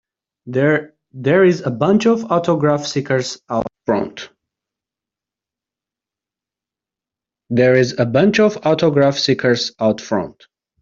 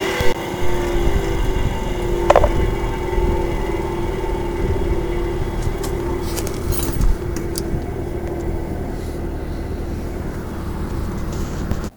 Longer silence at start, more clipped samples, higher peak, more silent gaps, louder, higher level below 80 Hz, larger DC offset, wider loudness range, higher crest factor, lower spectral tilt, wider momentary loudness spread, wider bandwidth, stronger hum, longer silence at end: first, 0.45 s vs 0 s; neither; about the same, -2 dBFS vs 0 dBFS; neither; first, -16 LUFS vs -23 LUFS; second, -56 dBFS vs -24 dBFS; neither; first, 11 LU vs 6 LU; about the same, 16 dB vs 20 dB; about the same, -6 dB/octave vs -6 dB/octave; about the same, 9 LU vs 7 LU; second, 7.8 kHz vs over 20 kHz; neither; first, 0.5 s vs 0 s